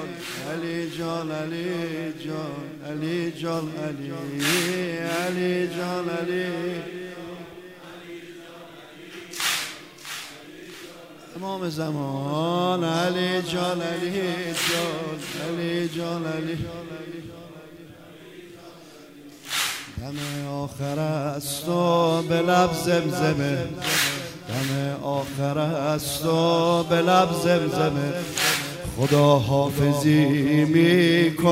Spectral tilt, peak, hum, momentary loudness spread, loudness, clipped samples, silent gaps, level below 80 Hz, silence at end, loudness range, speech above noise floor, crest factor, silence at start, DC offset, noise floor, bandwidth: -5 dB/octave; -6 dBFS; none; 21 LU; -24 LUFS; under 0.1%; none; -54 dBFS; 0 s; 11 LU; 22 dB; 20 dB; 0 s; under 0.1%; -45 dBFS; 16 kHz